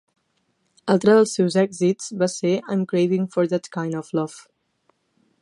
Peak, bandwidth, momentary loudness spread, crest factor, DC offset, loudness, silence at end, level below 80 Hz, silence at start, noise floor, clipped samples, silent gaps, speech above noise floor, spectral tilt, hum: -4 dBFS; 11.5 kHz; 11 LU; 18 dB; under 0.1%; -21 LUFS; 1 s; -70 dBFS; 0.85 s; -69 dBFS; under 0.1%; none; 49 dB; -6 dB/octave; none